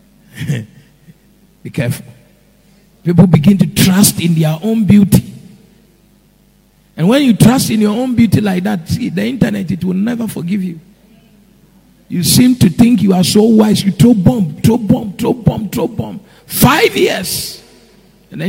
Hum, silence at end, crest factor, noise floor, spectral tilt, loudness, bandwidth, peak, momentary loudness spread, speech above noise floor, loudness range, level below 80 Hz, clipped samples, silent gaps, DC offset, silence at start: none; 0 s; 12 dB; -50 dBFS; -5.5 dB/octave; -12 LUFS; 16.5 kHz; 0 dBFS; 13 LU; 39 dB; 6 LU; -40 dBFS; 0.9%; none; under 0.1%; 0.35 s